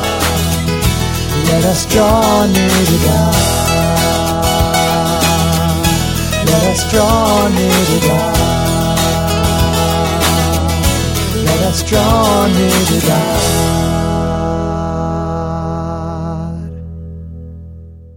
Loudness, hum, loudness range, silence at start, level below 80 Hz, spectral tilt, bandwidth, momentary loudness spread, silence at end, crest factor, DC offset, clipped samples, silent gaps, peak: -13 LUFS; none; 6 LU; 0 s; -24 dBFS; -4.5 dB/octave; 18 kHz; 10 LU; 0 s; 12 dB; under 0.1%; under 0.1%; none; 0 dBFS